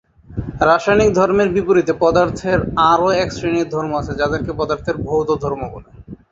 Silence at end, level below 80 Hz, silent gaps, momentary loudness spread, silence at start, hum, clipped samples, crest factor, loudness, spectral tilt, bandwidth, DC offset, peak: 0.15 s; -38 dBFS; none; 10 LU; 0.3 s; none; under 0.1%; 16 dB; -17 LUFS; -6 dB/octave; 7.8 kHz; under 0.1%; -2 dBFS